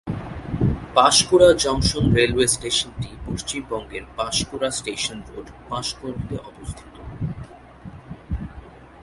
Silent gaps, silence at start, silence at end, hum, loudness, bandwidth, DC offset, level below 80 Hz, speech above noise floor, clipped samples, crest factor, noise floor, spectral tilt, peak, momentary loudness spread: none; 0.05 s; 0 s; none; -21 LUFS; 12 kHz; under 0.1%; -38 dBFS; 21 dB; under 0.1%; 22 dB; -42 dBFS; -4 dB/octave; 0 dBFS; 23 LU